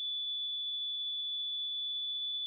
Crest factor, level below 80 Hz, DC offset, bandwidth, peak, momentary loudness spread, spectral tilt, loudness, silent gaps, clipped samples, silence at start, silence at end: 4 dB; -86 dBFS; under 0.1%; 3.8 kHz; -32 dBFS; 0 LU; 3.5 dB/octave; -34 LUFS; none; under 0.1%; 0 s; 0 s